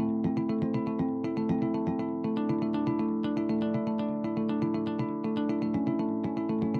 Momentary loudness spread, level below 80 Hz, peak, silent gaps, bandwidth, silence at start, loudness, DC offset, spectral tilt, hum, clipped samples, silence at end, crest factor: 2 LU; -62 dBFS; -18 dBFS; none; 6.2 kHz; 0 s; -30 LUFS; under 0.1%; -9.5 dB/octave; none; under 0.1%; 0 s; 12 dB